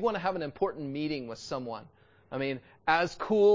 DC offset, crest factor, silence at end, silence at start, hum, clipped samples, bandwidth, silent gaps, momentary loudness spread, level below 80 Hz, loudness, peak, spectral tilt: under 0.1%; 18 dB; 0 s; 0 s; none; under 0.1%; 7.6 kHz; none; 10 LU; -64 dBFS; -32 LUFS; -12 dBFS; -5.5 dB/octave